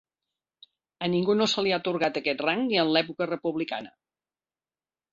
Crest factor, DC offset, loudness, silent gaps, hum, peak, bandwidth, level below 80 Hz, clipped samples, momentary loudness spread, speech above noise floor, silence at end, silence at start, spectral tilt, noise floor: 20 dB; under 0.1%; -26 LUFS; none; none; -8 dBFS; 7.6 kHz; -70 dBFS; under 0.1%; 8 LU; over 64 dB; 1.25 s; 1 s; -5 dB/octave; under -90 dBFS